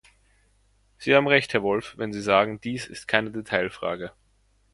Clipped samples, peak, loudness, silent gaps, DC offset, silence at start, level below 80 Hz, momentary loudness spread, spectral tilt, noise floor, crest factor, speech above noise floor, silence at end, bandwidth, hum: under 0.1%; -2 dBFS; -24 LUFS; none; under 0.1%; 1 s; -58 dBFS; 13 LU; -5 dB/octave; -64 dBFS; 24 dB; 40 dB; 0.65 s; 11.5 kHz; none